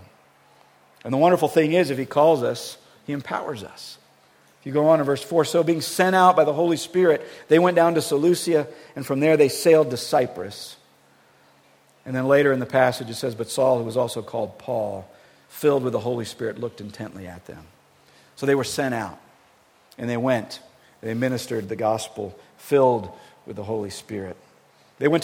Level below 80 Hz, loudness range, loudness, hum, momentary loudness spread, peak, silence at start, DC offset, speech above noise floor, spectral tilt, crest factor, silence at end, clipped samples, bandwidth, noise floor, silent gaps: -66 dBFS; 9 LU; -22 LUFS; none; 18 LU; -2 dBFS; 1.05 s; under 0.1%; 36 dB; -5.5 dB/octave; 20 dB; 0 s; under 0.1%; 17 kHz; -57 dBFS; none